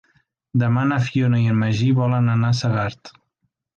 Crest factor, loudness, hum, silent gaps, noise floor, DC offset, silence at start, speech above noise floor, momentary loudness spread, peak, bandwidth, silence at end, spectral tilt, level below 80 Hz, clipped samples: 12 dB; -20 LUFS; none; none; -73 dBFS; under 0.1%; 0.55 s; 55 dB; 5 LU; -8 dBFS; 7.4 kHz; 0.65 s; -7.5 dB/octave; -52 dBFS; under 0.1%